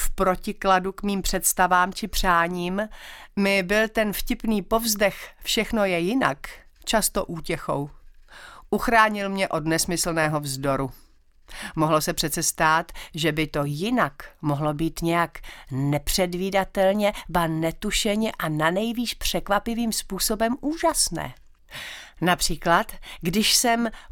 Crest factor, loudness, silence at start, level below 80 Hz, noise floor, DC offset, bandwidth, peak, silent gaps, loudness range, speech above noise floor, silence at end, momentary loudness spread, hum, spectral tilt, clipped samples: 22 dB; -23 LUFS; 0 s; -38 dBFS; -46 dBFS; under 0.1%; 18 kHz; -2 dBFS; none; 2 LU; 22 dB; 0 s; 11 LU; none; -3.5 dB/octave; under 0.1%